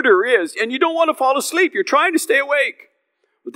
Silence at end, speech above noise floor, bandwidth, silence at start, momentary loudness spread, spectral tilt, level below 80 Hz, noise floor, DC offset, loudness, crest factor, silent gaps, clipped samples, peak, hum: 0.05 s; 52 dB; 16 kHz; 0 s; 4 LU; -1.5 dB/octave; under -90 dBFS; -68 dBFS; under 0.1%; -17 LUFS; 16 dB; none; under 0.1%; -2 dBFS; none